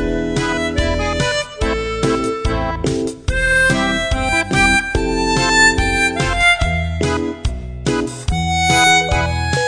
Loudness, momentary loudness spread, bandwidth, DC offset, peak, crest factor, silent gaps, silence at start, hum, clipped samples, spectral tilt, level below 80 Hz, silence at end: -16 LUFS; 9 LU; 10 kHz; under 0.1%; -2 dBFS; 16 dB; none; 0 s; none; under 0.1%; -4 dB/octave; -26 dBFS; 0 s